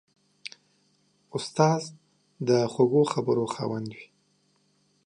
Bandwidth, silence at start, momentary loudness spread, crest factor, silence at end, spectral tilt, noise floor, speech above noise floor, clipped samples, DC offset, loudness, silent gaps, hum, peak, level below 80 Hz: 10.5 kHz; 1.35 s; 21 LU; 22 dB; 1 s; -6 dB/octave; -68 dBFS; 43 dB; under 0.1%; under 0.1%; -26 LUFS; none; 50 Hz at -55 dBFS; -6 dBFS; -72 dBFS